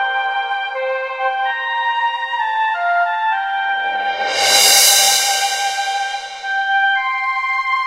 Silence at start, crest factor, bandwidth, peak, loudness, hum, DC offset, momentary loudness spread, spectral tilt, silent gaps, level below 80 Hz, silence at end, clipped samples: 0 s; 18 dB; 16 kHz; 0 dBFS; -15 LUFS; none; under 0.1%; 12 LU; 3 dB/octave; none; -64 dBFS; 0 s; under 0.1%